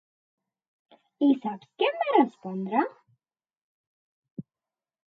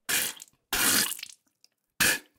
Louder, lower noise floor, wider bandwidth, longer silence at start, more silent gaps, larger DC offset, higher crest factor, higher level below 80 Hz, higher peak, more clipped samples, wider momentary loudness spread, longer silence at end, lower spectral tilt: about the same, -26 LUFS vs -25 LUFS; first, under -90 dBFS vs -68 dBFS; second, 4.7 kHz vs 19 kHz; first, 1.2 s vs 0.1 s; first, 3.57-4.22 s, 4.31-4.36 s vs none; neither; about the same, 22 dB vs 22 dB; second, -84 dBFS vs -58 dBFS; about the same, -8 dBFS vs -8 dBFS; neither; first, 22 LU vs 18 LU; first, 0.65 s vs 0.2 s; first, -8 dB/octave vs 0 dB/octave